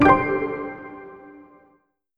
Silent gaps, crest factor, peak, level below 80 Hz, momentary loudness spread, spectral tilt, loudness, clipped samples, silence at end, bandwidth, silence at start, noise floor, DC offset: none; 20 dB; -2 dBFS; -46 dBFS; 26 LU; -8 dB/octave; -22 LUFS; under 0.1%; 0.85 s; 6.6 kHz; 0 s; -63 dBFS; under 0.1%